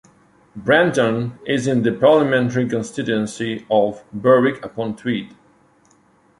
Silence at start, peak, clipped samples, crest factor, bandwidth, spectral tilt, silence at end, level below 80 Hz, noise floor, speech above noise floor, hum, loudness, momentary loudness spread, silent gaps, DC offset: 0.55 s; -2 dBFS; under 0.1%; 18 dB; 11.5 kHz; -6 dB/octave; 1.15 s; -58 dBFS; -56 dBFS; 38 dB; none; -19 LUFS; 11 LU; none; under 0.1%